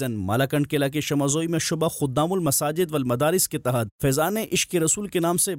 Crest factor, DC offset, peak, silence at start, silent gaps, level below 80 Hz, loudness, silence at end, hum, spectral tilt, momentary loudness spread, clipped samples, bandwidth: 12 dB; under 0.1%; -12 dBFS; 0 s; 3.91-3.99 s; -54 dBFS; -23 LUFS; 0 s; none; -4.5 dB/octave; 3 LU; under 0.1%; 16 kHz